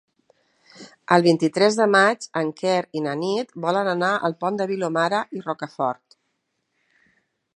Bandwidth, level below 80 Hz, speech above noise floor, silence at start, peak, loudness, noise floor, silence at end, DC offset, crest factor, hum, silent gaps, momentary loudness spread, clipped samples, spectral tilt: 11 kHz; -76 dBFS; 53 dB; 0.8 s; 0 dBFS; -22 LUFS; -74 dBFS; 1.65 s; under 0.1%; 22 dB; none; none; 10 LU; under 0.1%; -5 dB/octave